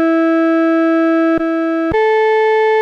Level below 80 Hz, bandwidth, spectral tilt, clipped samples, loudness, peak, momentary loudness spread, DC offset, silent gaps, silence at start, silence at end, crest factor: -44 dBFS; 6.4 kHz; -6.5 dB/octave; under 0.1%; -13 LUFS; -6 dBFS; 3 LU; under 0.1%; none; 0 s; 0 s; 6 dB